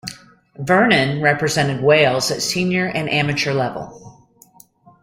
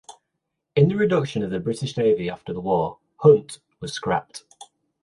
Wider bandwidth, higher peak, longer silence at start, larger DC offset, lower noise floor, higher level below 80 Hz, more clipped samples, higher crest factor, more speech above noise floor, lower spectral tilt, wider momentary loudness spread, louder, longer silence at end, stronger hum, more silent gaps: first, 16.5 kHz vs 11.5 kHz; about the same, -2 dBFS vs -4 dBFS; about the same, 0.05 s vs 0.1 s; neither; second, -50 dBFS vs -79 dBFS; about the same, -54 dBFS vs -56 dBFS; neither; about the same, 18 dB vs 20 dB; second, 32 dB vs 58 dB; second, -4.5 dB/octave vs -6.5 dB/octave; about the same, 14 LU vs 16 LU; first, -17 LUFS vs -22 LUFS; first, 0.9 s vs 0.65 s; neither; neither